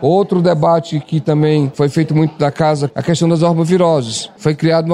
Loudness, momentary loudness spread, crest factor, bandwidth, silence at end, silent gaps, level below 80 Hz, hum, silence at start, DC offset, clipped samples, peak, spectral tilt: -14 LUFS; 5 LU; 12 dB; 11 kHz; 0 s; none; -54 dBFS; none; 0 s; under 0.1%; under 0.1%; -2 dBFS; -6.5 dB/octave